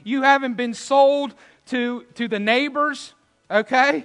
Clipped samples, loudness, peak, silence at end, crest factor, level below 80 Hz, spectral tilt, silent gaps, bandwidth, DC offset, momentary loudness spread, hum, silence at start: under 0.1%; -20 LUFS; -2 dBFS; 0 s; 20 dB; -74 dBFS; -4 dB/octave; none; 10.5 kHz; under 0.1%; 12 LU; none; 0.05 s